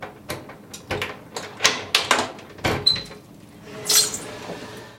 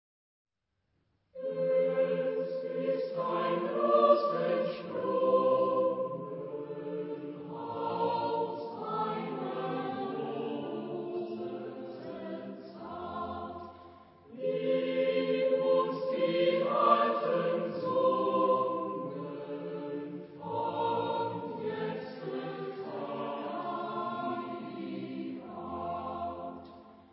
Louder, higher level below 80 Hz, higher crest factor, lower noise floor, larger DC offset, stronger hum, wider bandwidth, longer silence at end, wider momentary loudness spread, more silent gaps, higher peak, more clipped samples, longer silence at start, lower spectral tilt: first, -21 LUFS vs -32 LUFS; first, -52 dBFS vs -70 dBFS; about the same, 26 dB vs 22 dB; second, -44 dBFS vs -81 dBFS; neither; neither; first, 16.5 kHz vs 5.6 kHz; about the same, 0 s vs 0.1 s; first, 19 LU vs 14 LU; neither; first, 0 dBFS vs -10 dBFS; neither; second, 0 s vs 1.35 s; second, -1 dB/octave vs -4.5 dB/octave